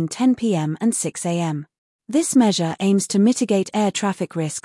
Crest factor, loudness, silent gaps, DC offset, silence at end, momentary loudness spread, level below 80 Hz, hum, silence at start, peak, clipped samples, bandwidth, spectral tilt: 14 dB; -20 LUFS; 1.78-1.99 s; under 0.1%; 0.05 s; 7 LU; -68 dBFS; none; 0 s; -6 dBFS; under 0.1%; 12 kHz; -5 dB/octave